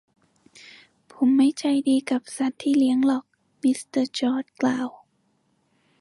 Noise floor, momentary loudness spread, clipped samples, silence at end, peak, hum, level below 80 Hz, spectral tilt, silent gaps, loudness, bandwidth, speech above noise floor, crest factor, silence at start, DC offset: -68 dBFS; 8 LU; under 0.1%; 1.1 s; -10 dBFS; none; -76 dBFS; -4 dB/octave; none; -23 LUFS; 11.5 kHz; 46 dB; 14 dB; 1.2 s; under 0.1%